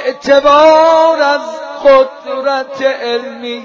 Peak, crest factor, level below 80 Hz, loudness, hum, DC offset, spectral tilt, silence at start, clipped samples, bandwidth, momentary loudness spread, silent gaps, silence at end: 0 dBFS; 10 dB; -50 dBFS; -10 LUFS; none; under 0.1%; -3 dB/octave; 0 s; under 0.1%; 7.4 kHz; 12 LU; none; 0 s